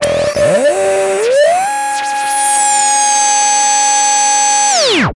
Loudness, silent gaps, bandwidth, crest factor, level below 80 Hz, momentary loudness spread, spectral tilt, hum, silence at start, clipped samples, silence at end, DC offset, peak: -10 LUFS; none; 11.5 kHz; 10 dB; -46 dBFS; 5 LU; -1 dB/octave; none; 0 s; under 0.1%; 0.05 s; under 0.1%; 0 dBFS